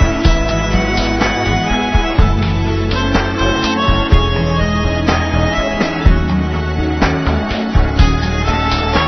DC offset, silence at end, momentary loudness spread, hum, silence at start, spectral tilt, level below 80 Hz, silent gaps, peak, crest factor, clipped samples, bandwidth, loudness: under 0.1%; 0 s; 3 LU; none; 0 s; -6 dB/octave; -18 dBFS; none; 0 dBFS; 14 dB; under 0.1%; 6.2 kHz; -15 LUFS